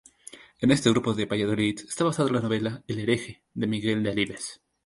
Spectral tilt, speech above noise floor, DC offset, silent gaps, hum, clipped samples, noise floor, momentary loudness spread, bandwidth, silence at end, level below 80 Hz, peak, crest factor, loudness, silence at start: -5.5 dB/octave; 24 dB; under 0.1%; none; none; under 0.1%; -49 dBFS; 15 LU; 11.5 kHz; 0.3 s; -58 dBFS; -6 dBFS; 20 dB; -26 LUFS; 0.35 s